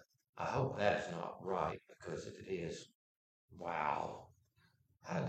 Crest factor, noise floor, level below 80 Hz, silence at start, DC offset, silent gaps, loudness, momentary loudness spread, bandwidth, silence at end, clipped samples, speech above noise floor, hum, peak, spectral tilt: 26 dB; -74 dBFS; -70 dBFS; 0 s; under 0.1%; 0.29-0.33 s, 2.95-3.48 s; -41 LUFS; 16 LU; 14 kHz; 0 s; under 0.1%; 34 dB; none; -16 dBFS; -6 dB/octave